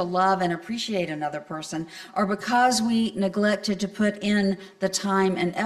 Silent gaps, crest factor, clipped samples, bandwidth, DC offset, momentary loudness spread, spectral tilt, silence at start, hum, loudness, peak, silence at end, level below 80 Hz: none; 16 dB; under 0.1%; 13.5 kHz; under 0.1%; 11 LU; -4.5 dB/octave; 0 s; none; -25 LUFS; -8 dBFS; 0 s; -62 dBFS